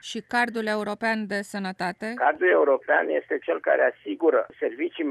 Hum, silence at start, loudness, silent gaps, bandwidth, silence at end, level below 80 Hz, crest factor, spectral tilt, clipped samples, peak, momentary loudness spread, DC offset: none; 0.05 s; -24 LUFS; none; 13 kHz; 0 s; -72 dBFS; 16 dB; -5 dB/octave; under 0.1%; -8 dBFS; 9 LU; under 0.1%